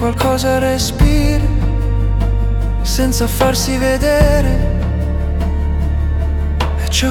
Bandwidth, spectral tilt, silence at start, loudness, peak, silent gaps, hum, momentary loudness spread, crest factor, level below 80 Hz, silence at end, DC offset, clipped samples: 18 kHz; -5.5 dB/octave; 0 s; -16 LUFS; 0 dBFS; none; none; 5 LU; 12 dB; -16 dBFS; 0 s; under 0.1%; under 0.1%